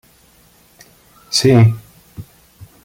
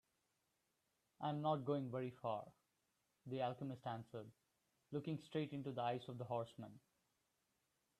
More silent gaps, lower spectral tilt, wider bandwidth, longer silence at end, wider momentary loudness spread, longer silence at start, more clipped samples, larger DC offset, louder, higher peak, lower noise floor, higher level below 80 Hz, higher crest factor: neither; second, -5.5 dB/octave vs -8 dB/octave; first, 16 kHz vs 13.5 kHz; second, 0.65 s vs 1.2 s; first, 27 LU vs 14 LU; about the same, 1.3 s vs 1.2 s; neither; neither; first, -13 LUFS vs -46 LUFS; first, -2 dBFS vs -28 dBFS; second, -51 dBFS vs -86 dBFS; first, -50 dBFS vs -86 dBFS; about the same, 16 dB vs 20 dB